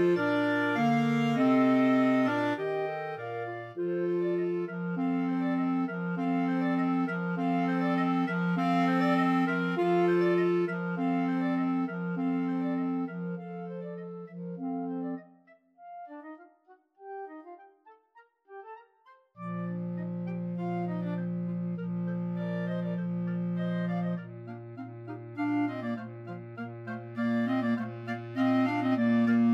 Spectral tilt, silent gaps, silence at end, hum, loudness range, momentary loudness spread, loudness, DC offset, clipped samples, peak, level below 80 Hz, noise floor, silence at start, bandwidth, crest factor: -8.5 dB/octave; none; 0 s; none; 14 LU; 17 LU; -30 LUFS; under 0.1%; under 0.1%; -16 dBFS; -80 dBFS; -62 dBFS; 0 s; 8 kHz; 14 dB